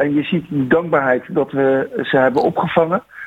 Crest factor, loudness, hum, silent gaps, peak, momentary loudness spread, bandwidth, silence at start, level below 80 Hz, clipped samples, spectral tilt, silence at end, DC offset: 16 dB; -17 LUFS; none; none; -2 dBFS; 4 LU; 8 kHz; 0 s; -54 dBFS; under 0.1%; -8 dB/octave; 0 s; under 0.1%